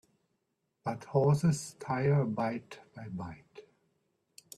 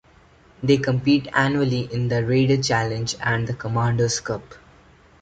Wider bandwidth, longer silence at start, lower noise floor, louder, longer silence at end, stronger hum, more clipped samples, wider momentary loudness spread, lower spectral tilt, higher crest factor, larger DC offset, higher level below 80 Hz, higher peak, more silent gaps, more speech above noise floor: first, 13 kHz vs 9.2 kHz; first, 0.85 s vs 0.6 s; first, -81 dBFS vs -53 dBFS; second, -32 LUFS vs -22 LUFS; first, 0.95 s vs 0.65 s; neither; neither; first, 18 LU vs 6 LU; first, -7 dB/octave vs -5.5 dB/octave; about the same, 18 dB vs 18 dB; neither; second, -68 dBFS vs -50 dBFS; second, -14 dBFS vs -4 dBFS; neither; first, 50 dB vs 32 dB